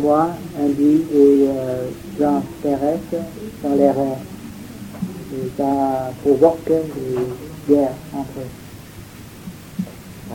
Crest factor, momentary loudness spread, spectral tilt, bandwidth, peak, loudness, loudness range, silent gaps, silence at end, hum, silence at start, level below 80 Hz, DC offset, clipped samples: 20 dB; 20 LU; -7.5 dB/octave; 17 kHz; 0 dBFS; -19 LUFS; 5 LU; none; 0 s; none; 0 s; -48 dBFS; under 0.1%; under 0.1%